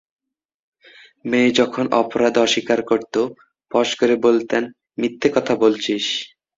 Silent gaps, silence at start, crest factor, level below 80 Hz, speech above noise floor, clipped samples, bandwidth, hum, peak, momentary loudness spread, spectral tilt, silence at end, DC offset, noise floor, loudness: none; 1.25 s; 18 dB; -60 dBFS; 30 dB; under 0.1%; 7.8 kHz; none; -2 dBFS; 9 LU; -4 dB/octave; 0.3 s; under 0.1%; -48 dBFS; -19 LUFS